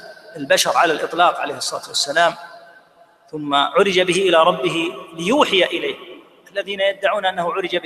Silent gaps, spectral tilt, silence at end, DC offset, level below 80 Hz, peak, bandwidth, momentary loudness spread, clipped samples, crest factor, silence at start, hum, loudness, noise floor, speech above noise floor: none; -3 dB/octave; 0 s; under 0.1%; -64 dBFS; 0 dBFS; 15 kHz; 14 LU; under 0.1%; 18 dB; 0 s; none; -18 LUFS; -52 dBFS; 33 dB